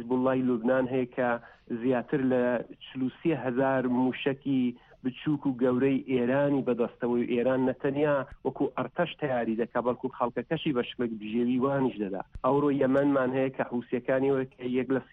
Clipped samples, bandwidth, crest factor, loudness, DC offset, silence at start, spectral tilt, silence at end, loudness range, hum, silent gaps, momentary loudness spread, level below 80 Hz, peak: under 0.1%; 3.9 kHz; 14 dB; -29 LUFS; under 0.1%; 0 s; -9.5 dB/octave; 0.1 s; 2 LU; none; none; 7 LU; -60 dBFS; -14 dBFS